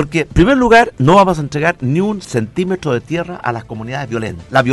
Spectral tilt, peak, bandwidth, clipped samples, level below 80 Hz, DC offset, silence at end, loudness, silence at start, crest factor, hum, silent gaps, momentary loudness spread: -6.5 dB/octave; 0 dBFS; 12 kHz; under 0.1%; -32 dBFS; under 0.1%; 0 s; -14 LUFS; 0 s; 14 dB; none; none; 12 LU